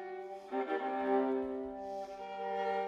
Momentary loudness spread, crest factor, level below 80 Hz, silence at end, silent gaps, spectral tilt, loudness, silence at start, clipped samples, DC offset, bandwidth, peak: 11 LU; 14 dB; -70 dBFS; 0 s; none; -6 dB/octave; -37 LUFS; 0 s; under 0.1%; under 0.1%; 7.4 kHz; -22 dBFS